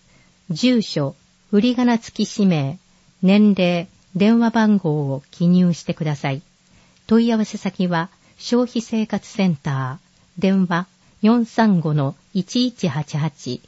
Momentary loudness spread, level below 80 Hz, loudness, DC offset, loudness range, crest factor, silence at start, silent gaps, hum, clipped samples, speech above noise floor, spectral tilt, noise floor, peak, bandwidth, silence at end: 11 LU; -60 dBFS; -19 LUFS; under 0.1%; 4 LU; 16 dB; 0.5 s; none; none; under 0.1%; 36 dB; -6.5 dB/octave; -54 dBFS; -4 dBFS; 8 kHz; 0.1 s